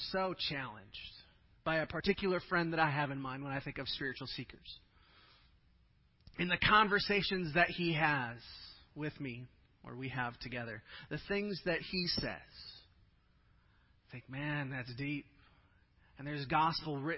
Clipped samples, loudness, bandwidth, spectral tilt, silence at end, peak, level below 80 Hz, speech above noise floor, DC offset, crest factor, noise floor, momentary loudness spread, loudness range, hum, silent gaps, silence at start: under 0.1%; -36 LUFS; 5.8 kHz; -8.5 dB/octave; 0 s; -14 dBFS; -60 dBFS; 33 dB; under 0.1%; 24 dB; -69 dBFS; 19 LU; 11 LU; none; none; 0 s